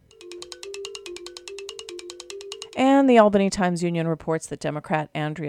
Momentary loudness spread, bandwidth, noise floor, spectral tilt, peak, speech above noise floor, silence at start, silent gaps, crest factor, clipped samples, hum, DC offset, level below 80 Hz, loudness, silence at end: 22 LU; 12.5 kHz; -42 dBFS; -5.5 dB/octave; -2 dBFS; 21 dB; 0.2 s; none; 22 dB; under 0.1%; none; under 0.1%; -58 dBFS; -21 LUFS; 0 s